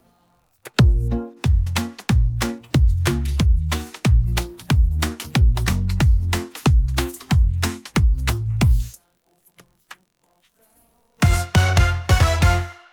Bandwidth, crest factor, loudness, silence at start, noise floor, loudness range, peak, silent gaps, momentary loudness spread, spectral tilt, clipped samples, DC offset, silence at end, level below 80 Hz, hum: 18.5 kHz; 16 dB; -20 LUFS; 0.65 s; -64 dBFS; 4 LU; -4 dBFS; none; 7 LU; -5.5 dB/octave; under 0.1%; under 0.1%; 0.2 s; -22 dBFS; none